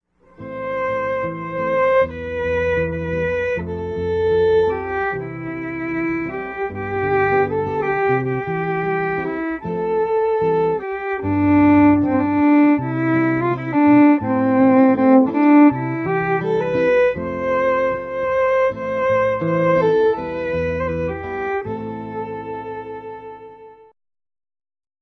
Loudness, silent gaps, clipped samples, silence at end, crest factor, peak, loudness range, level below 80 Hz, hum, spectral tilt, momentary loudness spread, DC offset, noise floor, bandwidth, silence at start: -18 LUFS; none; under 0.1%; 1.3 s; 16 dB; -2 dBFS; 7 LU; -46 dBFS; none; -9 dB/octave; 13 LU; under 0.1%; -41 dBFS; 6.2 kHz; 0.4 s